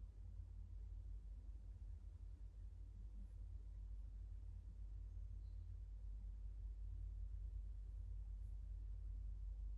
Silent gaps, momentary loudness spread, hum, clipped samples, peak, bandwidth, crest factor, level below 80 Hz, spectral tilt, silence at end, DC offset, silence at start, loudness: none; 5 LU; none; under 0.1%; -42 dBFS; 2 kHz; 10 dB; -52 dBFS; -8.5 dB/octave; 0 s; under 0.1%; 0 s; -56 LUFS